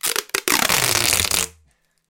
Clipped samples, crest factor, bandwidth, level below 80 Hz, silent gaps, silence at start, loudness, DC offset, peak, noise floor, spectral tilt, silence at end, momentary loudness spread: under 0.1%; 20 dB; over 20 kHz; -46 dBFS; none; 0.05 s; -17 LUFS; under 0.1%; -2 dBFS; -61 dBFS; -0.5 dB/octave; 0.7 s; 6 LU